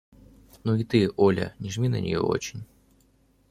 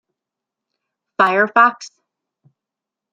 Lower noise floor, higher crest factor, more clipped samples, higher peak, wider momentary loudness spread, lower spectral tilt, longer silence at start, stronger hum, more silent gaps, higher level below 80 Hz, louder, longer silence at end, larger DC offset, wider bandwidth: second, -63 dBFS vs -85 dBFS; about the same, 20 dB vs 20 dB; neither; second, -8 dBFS vs -2 dBFS; second, 11 LU vs 19 LU; first, -6.5 dB/octave vs -4 dB/octave; second, 0.65 s vs 1.2 s; neither; neither; first, -56 dBFS vs -74 dBFS; second, -26 LUFS vs -14 LUFS; second, 0.85 s vs 1.25 s; neither; first, 14.5 kHz vs 9 kHz